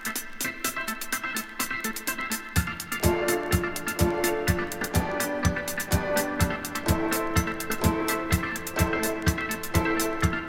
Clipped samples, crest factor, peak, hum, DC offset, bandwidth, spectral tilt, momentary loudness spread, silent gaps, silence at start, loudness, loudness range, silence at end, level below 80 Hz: under 0.1%; 20 dB; -8 dBFS; none; under 0.1%; 17 kHz; -4.5 dB/octave; 5 LU; none; 0 s; -27 LUFS; 2 LU; 0 s; -38 dBFS